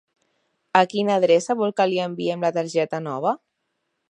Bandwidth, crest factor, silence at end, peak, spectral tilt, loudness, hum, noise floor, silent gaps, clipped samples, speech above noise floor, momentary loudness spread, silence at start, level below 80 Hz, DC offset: 10.5 kHz; 22 dB; 0.75 s; 0 dBFS; -5 dB/octave; -22 LUFS; none; -76 dBFS; none; under 0.1%; 55 dB; 7 LU; 0.75 s; -76 dBFS; under 0.1%